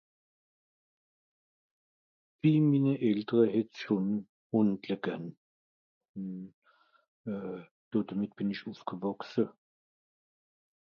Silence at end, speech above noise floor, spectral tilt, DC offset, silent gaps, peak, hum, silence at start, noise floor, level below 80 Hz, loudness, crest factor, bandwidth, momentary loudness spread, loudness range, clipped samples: 1.5 s; over 60 dB; -9 dB/octave; under 0.1%; 4.29-4.50 s, 5.37-6.01 s, 6.09-6.14 s, 6.54-6.62 s, 7.08-7.24 s, 7.71-7.91 s; -12 dBFS; none; 2.45 s; under -90 dBFS; -76 dBFS; -32 LUFS; 20 dB; 6.6 kHz; 16 LU; 10 LU; under 0.1%